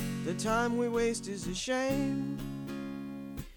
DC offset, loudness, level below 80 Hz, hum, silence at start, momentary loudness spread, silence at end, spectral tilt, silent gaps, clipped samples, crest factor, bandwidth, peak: under 0.1%; -33 LUFS; -50 dBFS; none; 0 s; 11 LU; 0 s; -5 dB/octave; none; under 0.1%; 14 dB; 19.5 kHz; -18 dBFS